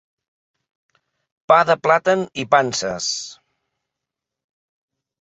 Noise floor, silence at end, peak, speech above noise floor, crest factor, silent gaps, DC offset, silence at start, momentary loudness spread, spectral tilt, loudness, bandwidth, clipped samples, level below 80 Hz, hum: -84 dBFS; 1.9 s; -2 dBFS; 66 dB; 20 dB; none; under 0.1%; 1.5 s; 9 LU; -3 dB/octave; -18 LUFS; 8.2 kHz; under 0.1%; -62 dBFS; none